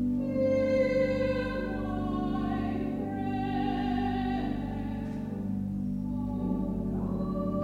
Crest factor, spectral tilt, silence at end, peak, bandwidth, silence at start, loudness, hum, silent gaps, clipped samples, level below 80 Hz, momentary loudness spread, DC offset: 14 dB; -8.5 dB/octave; 0 s; -16 dBFS; 7.8 kHz; 0 s; -31 LUFS; 50 Hz at -40 dBFS; none; under 0.1%; -44 dBFS; 7 LU; under 0.1%